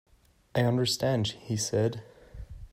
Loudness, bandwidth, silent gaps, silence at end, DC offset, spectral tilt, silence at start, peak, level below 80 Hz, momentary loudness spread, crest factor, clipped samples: -29 LUFS; 16 kHz; none; 0.05 s; under 0.1%; -5 dB/octave; 0.55 s; -14 dBFS; -52 dBFS; 21 LU; 16 dB; under 0.1%